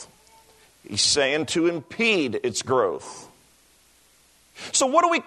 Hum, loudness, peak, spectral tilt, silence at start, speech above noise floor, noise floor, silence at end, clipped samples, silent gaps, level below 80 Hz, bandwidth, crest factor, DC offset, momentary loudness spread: none; -22 LUFS; -6 dBFS; -2.5 dB/octave; 0 s; 36 dB; -58 dBFS; 0.05 s; under 0.1%; none; -64 dBFS; 12.5 kHz; 20 dB; under 0.1%; 16 LU